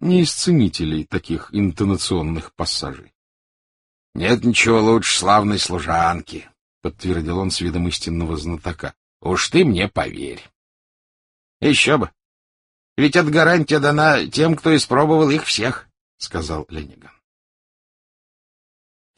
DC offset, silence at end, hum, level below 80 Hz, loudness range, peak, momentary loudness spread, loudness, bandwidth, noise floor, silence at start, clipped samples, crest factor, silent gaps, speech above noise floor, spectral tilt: under 0.1%; 2.3 s; none; -42 dBFS; 8 LU; -2 dBFS; 17 LU; -18 LUFS; 11.5 kHz; under -90 dBFS; 0 s; under 0.1%; 18 dB; 3.15-4.13 s, 6.61-6.81 s, 8.97-9.20 s, 10.55-11.60 s, 12.25-12.96 s, 16.01-16.18 s; over 72 dB; -4.5 dB/octave